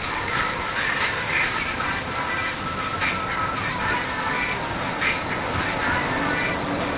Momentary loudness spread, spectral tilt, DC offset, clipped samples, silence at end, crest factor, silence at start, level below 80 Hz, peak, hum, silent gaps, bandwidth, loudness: 4 LU; -2.5 dB/octave; under 0.1%; under 0.1%; 0 s; 16 dB; 0 s; -42 dBFS; -10 dBFS; none; none; 4 kHz; -24 LUFS